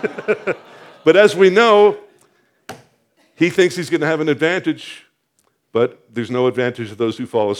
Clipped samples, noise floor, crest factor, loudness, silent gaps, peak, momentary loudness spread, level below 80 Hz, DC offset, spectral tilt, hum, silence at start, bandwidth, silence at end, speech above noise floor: under 0.1%; -65 dBFS; 18 dB; -16 LUFS; none; 0 dBFS; 14 LU; -72 dBFS; under 0.1%; -5.5 dB/octave; none; 0 s; 13 kHz; 0 s; 49 dB